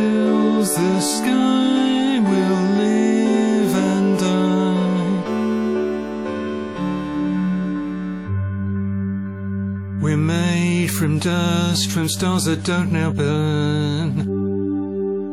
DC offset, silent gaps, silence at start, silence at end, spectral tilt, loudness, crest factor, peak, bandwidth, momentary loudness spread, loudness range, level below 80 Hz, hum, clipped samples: 0.2%; none; 0 s; 0 s; -5.5 dB/octave; -19 LUFS; 14 dB; -6 dBFS; 15 kHz; 8 LU; 6 LU; -54 dBFS; none; under 0.1%